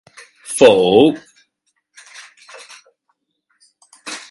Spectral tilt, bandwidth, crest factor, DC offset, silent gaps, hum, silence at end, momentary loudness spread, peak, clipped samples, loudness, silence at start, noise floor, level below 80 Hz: -4 dB/octave; 11.5 kHz; 18 dB; under 0.1%; none; none; 0.1 s; 27 LU; 0 dBFS; under 0.1%; -12 LUFS; 0.5 s; -69 dBFS; -58 dBFS